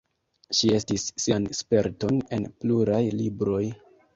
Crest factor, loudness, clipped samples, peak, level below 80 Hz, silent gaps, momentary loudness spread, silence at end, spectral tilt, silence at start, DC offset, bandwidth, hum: 18 dB; -25 LUFS; under 0.1%; -8 dBFS; -54 dBFS; none; 6 LU; 0.4 s; -5 dB/octave; 0.5 s; under 0.1%; 8 kHz; none